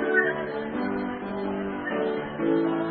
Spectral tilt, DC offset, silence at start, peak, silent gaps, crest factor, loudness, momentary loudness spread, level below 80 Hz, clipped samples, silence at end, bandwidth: -10.5 dB/octave; under 0.1%; 0 s; -8 dBFS; none; 18 dB; -28 LUFS; 7 LU; -58 dBFS; under 0.1%; 0 s; 4.6 kHz